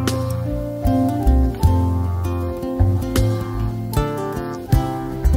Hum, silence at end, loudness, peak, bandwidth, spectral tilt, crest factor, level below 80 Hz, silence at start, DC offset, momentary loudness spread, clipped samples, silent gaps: none; 0 s; -21 LUFS; -2 dBFS; 16.5 kHz; -7.5 dB/octave; 16 dB; -24 dBFS; 0 s; under 0.1%; 7 LU; under 0.1%; none